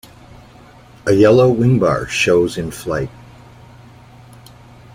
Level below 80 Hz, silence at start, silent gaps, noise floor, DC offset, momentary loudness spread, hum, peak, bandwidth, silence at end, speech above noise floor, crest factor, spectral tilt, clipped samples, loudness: -44 dBFS; 1.05 s; none; -43 dBFS; under 0.1%; 14 LU; none; -2 dBFS; 16 kHz; 1.85 s; 29 dB; 16 dB; -6 dB/octave; under 0.1%; -15 LUFS